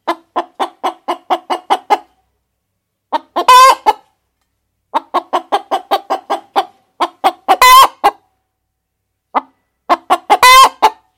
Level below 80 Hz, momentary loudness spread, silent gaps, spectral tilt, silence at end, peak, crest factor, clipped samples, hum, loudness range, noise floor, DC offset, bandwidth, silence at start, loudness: -48 dBFS; 16 LU; none; 0 dB/octave; 0.25 s; 0 dBFS; 14 dB; 0.1%; none; 8 LU; -71 dBFS; under 0.1%; 17.5 kHz; 0.05 s; -11 LUFS